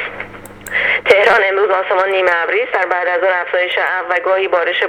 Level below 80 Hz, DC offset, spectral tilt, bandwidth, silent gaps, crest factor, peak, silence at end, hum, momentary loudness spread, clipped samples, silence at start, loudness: -52 dBFS; under 0.1%; -3 dB/octave; 17 kHz; none; 14 dB; 0 dBFS; 0 s; none; 8 LU; under 0.1%; 0 s; -14 LUFS